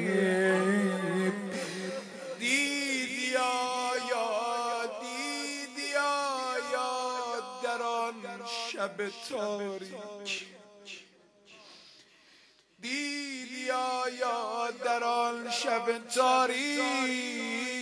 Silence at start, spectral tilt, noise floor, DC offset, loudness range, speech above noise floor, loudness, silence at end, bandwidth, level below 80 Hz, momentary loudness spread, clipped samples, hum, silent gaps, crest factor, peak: 0 s; -3.5 dB/octave; -62 dBFS; under 0.1%; 10 LU; 31 dB; -31 LUFS; 0 s; 11 kHz; -84 dBFS; 11 LU; under 0.1%; none; none; 20 dB; -12 dBFS